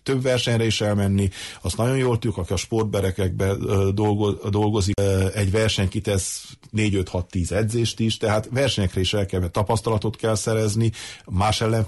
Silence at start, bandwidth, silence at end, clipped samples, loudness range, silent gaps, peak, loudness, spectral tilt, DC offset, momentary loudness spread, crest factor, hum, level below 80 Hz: 0.05 s; 12 kHz; 0 s; under 0.1%; 1 LU; none; -10 dBFS; -22 LUFS; -5.5 dB/octave; under 0.1%; 5 LU; 12 dB; none; -42 dBFS